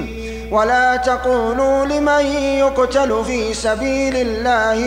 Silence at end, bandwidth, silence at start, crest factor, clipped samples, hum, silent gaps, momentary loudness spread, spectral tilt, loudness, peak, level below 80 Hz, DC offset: 0 s; 15.5 kHz; 0 s; 12 dB; under 0.1%; none; none; 5 LU; -4 dB/octave; -16 LUFS; -4 dBFS; -34 dBFS; under 0.1%